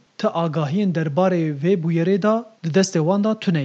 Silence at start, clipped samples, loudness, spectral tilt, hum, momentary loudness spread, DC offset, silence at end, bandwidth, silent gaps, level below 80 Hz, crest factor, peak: 0.2 s; under 0.1%; -20 LUFS; -6.5 dB/octave; none; 4 LU; under 0.1%; 0 s; 8.2 kHz; none; -72 dBFS; 14 dB; -4 dBFS